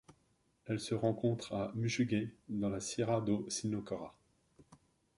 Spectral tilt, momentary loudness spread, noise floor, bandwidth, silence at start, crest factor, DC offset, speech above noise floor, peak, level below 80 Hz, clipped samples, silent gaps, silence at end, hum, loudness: -5.5 dB/octave; 9 LU; -75 dBFS; 11.5 kHz; 0.1 s; 20 dB; under 0.1%; 39 dB; -18 dBFS; -66 dBFS; under 0.1%; none; 0.4 s; none; -37 LUFS